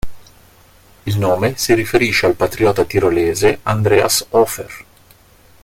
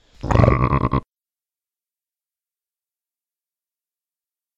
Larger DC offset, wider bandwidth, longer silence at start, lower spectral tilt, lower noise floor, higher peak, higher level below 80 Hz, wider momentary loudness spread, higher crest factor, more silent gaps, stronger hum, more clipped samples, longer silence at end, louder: neither; first, 17 kHz vs 7.6 kHz; second, 0.05 s vs 0.25 s; second, -4.5 dB/octave vs -8.5 dB/octave; second, -48 dBFS vs under -90 dBFS; about the same, 0 dBFS vs 0 dBFS; second, -40 dBFS vs -32 dBFS; first, 13 LU vs 8 LU; second, 16 dB vs 24 dB; neither; neither; neither; second, 0.8 s vs 3.55 s; first, -15 LUFS vs -19 LUFS